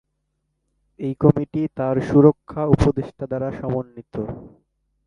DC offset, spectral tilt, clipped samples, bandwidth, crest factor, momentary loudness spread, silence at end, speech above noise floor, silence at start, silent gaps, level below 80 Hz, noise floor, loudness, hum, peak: under 0.1%; -9.5 dB/octave; under 0.1%; 10.5 kHz; 20 dB; 16 LU; 0.6 s; 54 dB; 1 s; none; -40 dBFS; -74 dBFS; -21 LUFS; none; 0 dBFS